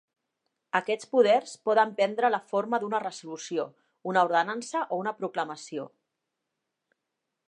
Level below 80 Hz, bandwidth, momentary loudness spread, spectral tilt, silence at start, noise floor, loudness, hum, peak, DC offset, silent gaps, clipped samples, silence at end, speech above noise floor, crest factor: -88 dBFS; 11 kHz; 14 LU; -4 dB/octave; 0.75 s; -84 dBFS; -27 LUFS; none; -10 dBFS; under 0.1%; none; under 0.1%; 1.6 s; 57 dB; 20 dB